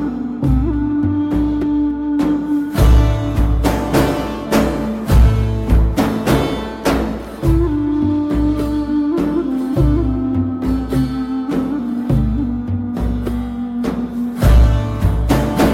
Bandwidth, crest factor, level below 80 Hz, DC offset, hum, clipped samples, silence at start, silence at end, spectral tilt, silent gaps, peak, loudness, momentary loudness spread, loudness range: 16 kHz; 12 dB; -20 dBFS; under 0.1%; none; under 0.1%; 0 s; 0 s; -7.5 dB/octave; none; -2 dBFS; -17 LUFS; 7 LU; 3 LU